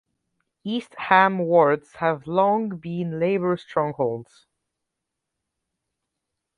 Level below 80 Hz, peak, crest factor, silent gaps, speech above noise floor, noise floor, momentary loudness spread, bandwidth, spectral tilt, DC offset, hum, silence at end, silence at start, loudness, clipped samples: -66 dBFS; -2 dBFS; 22 dB; none; 61 dB; -83 dBFS; 12 LU; 10.5 kHz; -7.5 dB/octave; under 0.1%; none; 2.35 s; 0.65 s; -22 LUFS; under 0.1%